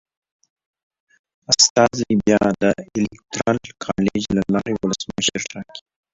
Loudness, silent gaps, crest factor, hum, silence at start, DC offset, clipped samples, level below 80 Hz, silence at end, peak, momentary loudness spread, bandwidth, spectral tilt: -19 LUFS; 1.70-1.75 s; 20 dB; none; 1.5 s; under 0.1%; under 0.1%; -50 dBFS; 0.35 s; -2 dBFS; 14 LU; 7.8 kHz; -3.5 dB/octave